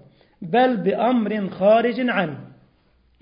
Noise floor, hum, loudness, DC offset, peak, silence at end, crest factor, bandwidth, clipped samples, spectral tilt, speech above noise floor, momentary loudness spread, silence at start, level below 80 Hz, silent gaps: -60 dBFS; none; -20 LUFS; under 0.1%; -6 dBFS; 0.75 s; 16 dB; 5.2 kHz; under 0.1%; -11 dB/octave; 41 dB; 11 LU; 0.4 s; -64 dBFS; none